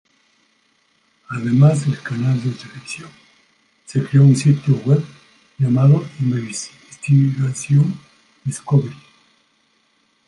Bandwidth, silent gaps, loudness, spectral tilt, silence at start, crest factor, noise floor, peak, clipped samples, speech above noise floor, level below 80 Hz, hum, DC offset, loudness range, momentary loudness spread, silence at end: 11 kHz; none; -17 LUFS; -7.5 dB/octave; 1.3 s; 16 dB; -62 dBFS; -2 dBFS; under 0.1%; 46 dB; -60 dBFS; none; under 0.1%; 4 LU; 18 LU; 1.35 s